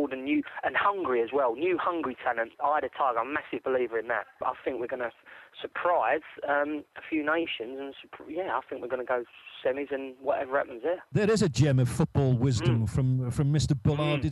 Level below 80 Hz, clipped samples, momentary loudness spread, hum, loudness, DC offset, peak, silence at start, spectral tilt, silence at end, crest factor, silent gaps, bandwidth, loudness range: -52 dBFS; under 0.1%; 10 LU; none; -29 LUFS; under 0.1%; -10 dBFS; 0 s; -6.5 dB/octave; 0 s; 18 dB; none; 12 kHz; 6 LU